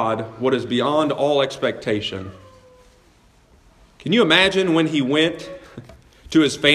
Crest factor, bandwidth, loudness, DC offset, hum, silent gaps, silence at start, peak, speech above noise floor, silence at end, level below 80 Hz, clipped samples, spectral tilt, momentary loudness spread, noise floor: 20 dB; 12.5 kHz; -19 LUFS; under 0.1%; none; none; 0 s; 0 dBFS; 35 dB; 0 s; -54 dBFS; under 0.1%; -4.5 dB/octave; 19 LU; -54 dBFS